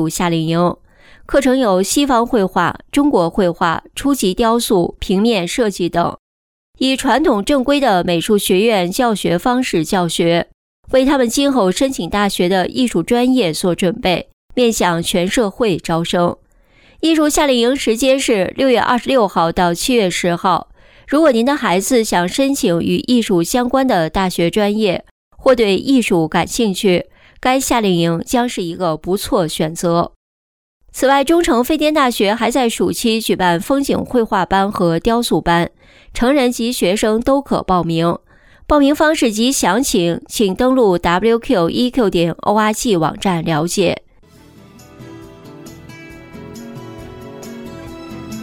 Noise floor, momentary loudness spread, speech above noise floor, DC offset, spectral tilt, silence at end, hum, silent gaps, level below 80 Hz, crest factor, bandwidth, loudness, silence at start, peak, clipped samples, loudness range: -50 dBFS; 6 LU; 35 dB; under 0.1%; -4.5 dB/octave; 0 s; none; 6.19-6.73 s, 10.54-10.83 s, 14.33-14.49 s, 25.11-25.31 s, 30.16-30.80 s; -40 dBFS; 12 dB; 19 kHz; -15 LUFS; 0 s; -2 dBFS; under 0.1%; 3 LU